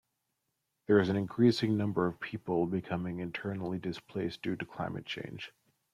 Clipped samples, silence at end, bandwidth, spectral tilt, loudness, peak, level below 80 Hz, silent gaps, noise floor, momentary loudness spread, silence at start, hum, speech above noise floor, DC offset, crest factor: under 0.1%; 0.45 s; 13 kHz; -7.5 dB/octave; -33 LUFS; -12 dBFS; -68 dBFS; none; -83 dBFS; 13 LU; 0.9 s; none; 51 dB; under 0.1%; 22 dB